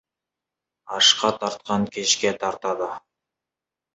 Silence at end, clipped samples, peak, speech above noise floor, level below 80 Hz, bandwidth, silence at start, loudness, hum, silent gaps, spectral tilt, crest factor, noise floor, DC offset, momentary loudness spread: 0.95 s; under 0.1%; -2 dBFS; 65 dB; -64 dBFS; 8.2 kHz; 0.85 s; -21 LUFS; none; none; -2 dB/octave; 24 dB; -88 dBFS; under 0.1%; 15 LU